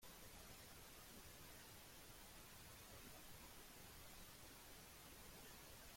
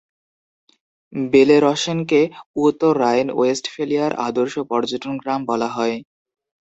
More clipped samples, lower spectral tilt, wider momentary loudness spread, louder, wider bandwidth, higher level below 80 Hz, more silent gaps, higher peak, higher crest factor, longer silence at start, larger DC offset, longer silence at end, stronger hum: neither; second, -2.5 dB/octave vs -5 dB/octave; second, 1 LU vs 9 LU; second, -60 LUFS vs -19 LUFS; first, 16.5 kHz vs 8.2 kHz; second, -70 dBFS vs -62 dBFS; second, none vs 2.46-2.54 s; second, -46 dBFS vs -2 dBFS; about the same, 14 dB vs 18 dB; second, 0 s vs 1.1 s; neither; second, 0 s vs 0.75 s; neither